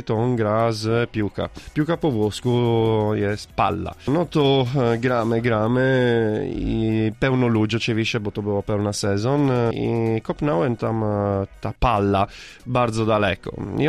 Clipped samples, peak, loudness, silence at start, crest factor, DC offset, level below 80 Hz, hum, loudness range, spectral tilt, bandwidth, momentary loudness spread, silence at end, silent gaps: under 0.1%; -6 dBFS; -21 LUFS; 0 s; 14 dB; under 0.1%; -40 dBFS; none; 2 LU; -6.5 dB/octave; 12.5 kHz; 6 LU; 0 s; none